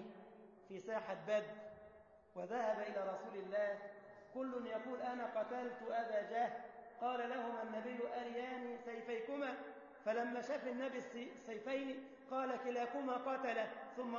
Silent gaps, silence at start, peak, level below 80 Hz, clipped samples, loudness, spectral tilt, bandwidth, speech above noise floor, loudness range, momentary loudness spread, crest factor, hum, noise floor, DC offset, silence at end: none; 0 s; -28 dBFS; -86 dBFS; under 0.1%; -44 LUFS; -3 dB/octave; 7 kHz; 21 dB; 2 LU; 13 LU; 16 dB; none; -64 dBFS; under 0.1%; 0 s